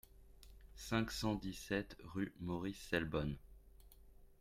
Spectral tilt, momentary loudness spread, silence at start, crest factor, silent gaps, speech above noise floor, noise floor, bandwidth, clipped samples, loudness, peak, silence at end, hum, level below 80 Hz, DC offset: -5.5 dB/octave; 14 LU; 0.1 s; 22 dB; none; 21 dB; -62 dBFS; 16 kHz; under 0.1%; -42 LUFS; -22 dBFS; 0.05 s; none; -58 dBFS; under 0.1%